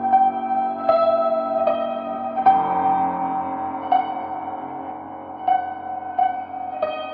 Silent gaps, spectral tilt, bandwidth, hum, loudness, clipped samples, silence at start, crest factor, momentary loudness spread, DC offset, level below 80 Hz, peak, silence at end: none; -4 dB/octave; 4.8 kHz; none; -22 LUFS; under 0.1%; 0 s; 18 dB; 12 LU; under 0.1%; -66 dBFS; -4 dBFS; 0 s